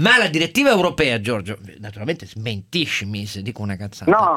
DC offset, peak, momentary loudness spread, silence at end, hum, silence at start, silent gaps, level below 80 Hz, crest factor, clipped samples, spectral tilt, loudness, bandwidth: under 0.1%; 0 dBFS; 14 LU; 0 s; none; 0 s; none; -52 dBFS; 20 dB; under 0.1%; -4.5 dB/octave; -20 LUFS; 16.5 kHz